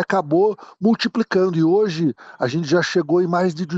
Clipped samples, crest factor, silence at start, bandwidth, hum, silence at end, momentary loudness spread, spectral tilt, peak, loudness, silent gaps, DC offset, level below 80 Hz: under 0.1%; 12 dB; 0 s; 8 kHz; none; 0 s; 6 LU; -6.5 dB/octave; -6 dBFS; -19 LUFS; none; under 0.1%; -64 dBFS